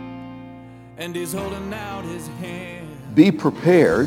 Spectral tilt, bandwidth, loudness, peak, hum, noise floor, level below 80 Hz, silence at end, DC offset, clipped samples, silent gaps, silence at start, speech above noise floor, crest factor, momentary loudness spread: -6.5 dB/octave; 16.5 kHz; -21 LUFS; 0 dBFS; none; -41 dBFS; -50 dBFS; 0 s; under 0.1%; under 0.1%; none; 0 s; 21 dB; 20 dB; 22 LU